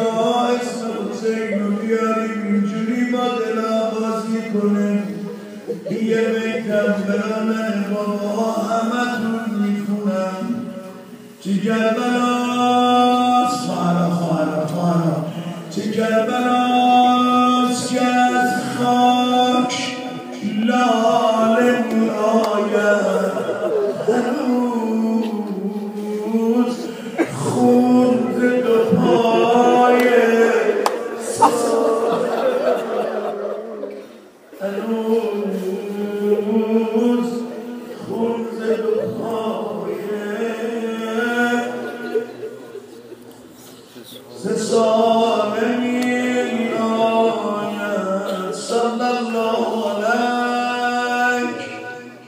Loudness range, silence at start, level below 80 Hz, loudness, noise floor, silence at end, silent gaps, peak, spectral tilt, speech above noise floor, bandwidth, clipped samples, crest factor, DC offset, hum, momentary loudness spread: 7 LU; 0 s; -70 dBFS; -19 LUFS; -42 dBFS; 0 s; none; 0 dBFS; -5.5 dB/octave; 24 dB; 15.5 kHz; under 0.1%; 18 dB; under 0.1%; none; 12 LU